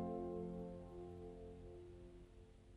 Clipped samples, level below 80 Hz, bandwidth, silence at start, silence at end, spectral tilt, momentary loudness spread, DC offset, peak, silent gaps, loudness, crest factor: under 0.1%; -62 dBFS; 11 kHz; 0 s; 0 s; -9 dB/octave; 15 LU; under 0.1%; -34 dBFS; none; -52 LUFS; 16 dB